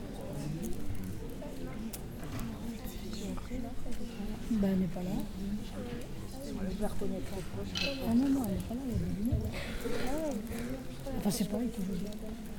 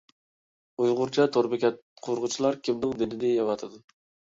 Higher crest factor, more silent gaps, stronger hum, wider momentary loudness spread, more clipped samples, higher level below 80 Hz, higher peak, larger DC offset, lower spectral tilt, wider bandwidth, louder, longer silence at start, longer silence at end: about the same, 16 dB vs 18 dB; second, none vs 1.82-1.96 s; neither; about the same, 11 LU vs 10 LU; neither; first, -44 dBFS vs -66 dBFS; second, -18 dBFS vs -10 dBFS; neither; about the same, -6 dB/octave vs -5 dB/octave; first, 18 kHz vs 7.8 kHz; second, -37 LUFS vs -27 LUFS; second, 0 s vs 0.8 s; second, 0 s vs 0.55 s